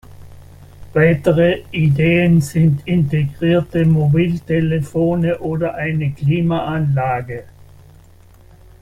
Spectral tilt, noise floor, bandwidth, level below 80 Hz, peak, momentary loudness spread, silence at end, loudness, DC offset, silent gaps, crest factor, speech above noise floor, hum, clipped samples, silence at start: -8 dB/octave; -44 dBFS; 12.5 kHz; -42 dBFS; -2 dBFS; 7 LU; 1.4 s; -16 LUFS; under 0.1%; none; 14 dB; 29 dB; none; under 0.1%; 0.1 s